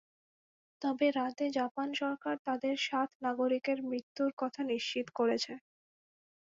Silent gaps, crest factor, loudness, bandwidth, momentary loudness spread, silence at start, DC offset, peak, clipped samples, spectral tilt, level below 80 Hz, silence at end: 1.71-1.75 s, 2.39-2.45 s, 3.15-3.20 s, 4.03-4.15 s, 4.33-4.37 s; 16 dB; -34 LUFS; 7.8 kHz; 6 LU; 0.8 s; under 0.1%; -18 dBFS; under 0.1%; -3.5 dB/octave; -82 dBFS; 1 s